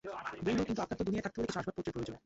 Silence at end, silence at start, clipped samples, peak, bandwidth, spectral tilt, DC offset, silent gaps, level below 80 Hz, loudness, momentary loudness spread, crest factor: 0.05 s; 0.05 s; under 0.1%; -22 dBFS; 8 kHz; -5.5 dB/octave; under 0.1%; none; -58 dBFS; -37 LUFS; 6 LU; 16 dB